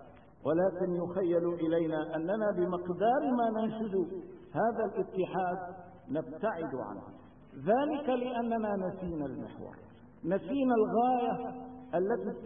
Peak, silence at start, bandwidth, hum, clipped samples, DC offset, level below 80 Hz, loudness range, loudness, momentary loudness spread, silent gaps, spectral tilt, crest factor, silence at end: -16 dBFS; 0 s; 3.7 kHz; none; under 0.1%; under 0.1%; -64 dBFS; 4 LU; -32 LUFS; 13 LU; none; -10.5 dB/octave; 16 dB; 0 s